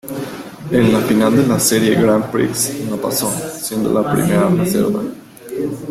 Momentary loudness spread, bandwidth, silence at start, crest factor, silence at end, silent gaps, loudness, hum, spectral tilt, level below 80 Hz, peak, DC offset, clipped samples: 13 LU; 16.5 kHz; 0.05 s; 14 dB; 0 s; none; -16 LUFS; none; -5 dB/octave; -48 dBFS; -2 dBFS; under 0.1%; under 0.1%